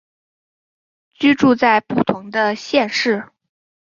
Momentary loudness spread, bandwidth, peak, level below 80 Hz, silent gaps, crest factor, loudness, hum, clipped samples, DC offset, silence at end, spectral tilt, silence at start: 7 LU; 7.4 kHz; -2 dBFS; -58 dBFS; none; 18 dB; -17 LUFS; none; under 0.1%; under 0.1%; 0.55 s; -5 dB/octave; 1.2 s